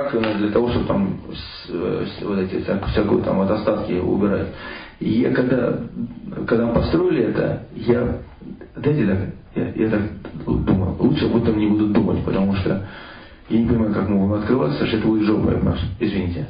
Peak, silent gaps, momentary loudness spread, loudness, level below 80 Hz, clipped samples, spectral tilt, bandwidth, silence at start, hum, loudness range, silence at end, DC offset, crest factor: -6 dBFS; none; 11 LU; -20 LUFS; -36 dBFS; under 0.1%; -12.5 dB/octave; 5.2 kHz; 0 s; none; 2 LU; 0 s; under 0.1%; 14 dB